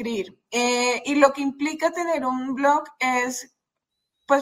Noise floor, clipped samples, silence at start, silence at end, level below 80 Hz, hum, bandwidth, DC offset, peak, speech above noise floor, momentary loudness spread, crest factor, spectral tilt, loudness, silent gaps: -82 dBFS; under 0.1%; 0 s; 0 s; -68 dBFS; none; 16 kHz; under 0.1%; -2 dBFS; 59 dB; 9 LU; 22 dB; -2.5 dB/octave; -23 LUFS; none